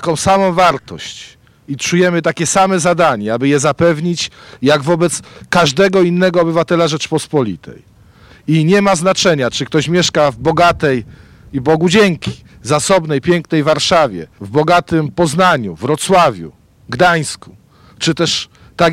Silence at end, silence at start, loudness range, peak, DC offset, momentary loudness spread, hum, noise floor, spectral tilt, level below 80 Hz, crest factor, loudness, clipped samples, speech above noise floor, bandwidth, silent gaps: 0 s; 0 s; 1 LU; -2 dBFS; under 0.1%; 12 LU; none; -43 dBFS; -4.5 dB/octave; -46 dBFS; 12 dB; -13 LUFS; under 0.1%; 30 dB; 15.5 kHz; none